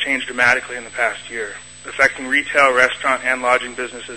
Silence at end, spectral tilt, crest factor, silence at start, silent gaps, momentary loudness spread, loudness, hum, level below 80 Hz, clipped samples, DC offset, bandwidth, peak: 0 s; -2 dB/octave; 18 dB; 0 s; none; 14 LU; -17 LUFS; 60 Hz at -50 dBFS; -54 dBFS; under 0.1%; 0.3%; 11 kHz; 0 dBFS